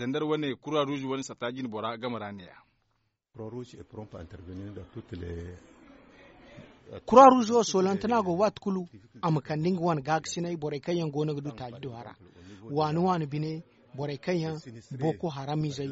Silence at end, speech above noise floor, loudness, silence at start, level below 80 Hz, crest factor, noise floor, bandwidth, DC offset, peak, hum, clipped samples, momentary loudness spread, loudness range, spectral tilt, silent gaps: 0 s; 48 dB; -27 LUFS; 0 s; -60 dBFS; 24 dB; -76 dBFS; 8 kHz; under 0.1%; -4 dBFS; none; under 0.1%; 19 LU; 19 LU; -5.5 dB/octave; none